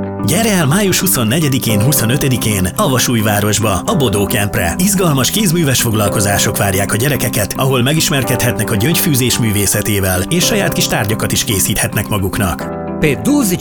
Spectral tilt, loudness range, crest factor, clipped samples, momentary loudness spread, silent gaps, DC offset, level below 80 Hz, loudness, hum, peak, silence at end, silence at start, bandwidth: -4 dB/octave; 1 LU; 14 dB; under 0.1%; 4 LU; none; under 0.1%; -36 dBFS; -13 LUFS; none; 0 dBFS; 0 s; 0 s; 19.5 kHz